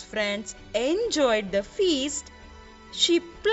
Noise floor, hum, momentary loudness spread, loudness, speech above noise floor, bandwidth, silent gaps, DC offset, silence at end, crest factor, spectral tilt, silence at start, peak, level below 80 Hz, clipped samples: -47 dBFS; none; 11 LU; -25 LUFS; 21 dB; 8.2 kHz; none; under 0.1%; 0 s; 18 dB; -2.5 dB/octave; 0 s; -8 dBFS; -52 dBFS; under 0.1%